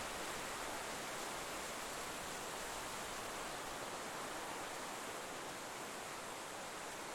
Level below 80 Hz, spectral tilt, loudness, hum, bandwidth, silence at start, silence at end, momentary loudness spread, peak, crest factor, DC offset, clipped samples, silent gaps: -66 dBFS; -1.5 dB/octave; -45 LUFS; none; 19 kHz; 0 s; 0 s; 3 LU; -32 dBFS; 14 dB; under 0.1%; under 0.1%; none